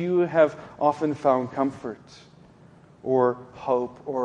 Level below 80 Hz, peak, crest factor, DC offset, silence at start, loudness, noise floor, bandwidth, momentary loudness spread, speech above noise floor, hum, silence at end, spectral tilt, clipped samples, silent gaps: -64 dBFS; -6 dBFS; 20 dB; under 0.1%; 0 s; -24 LUFS; -52 dBFS; 9.2 kHz; 15 LU; 28 dB; none; 0 s; -8 dB/octave; under 0.1%; none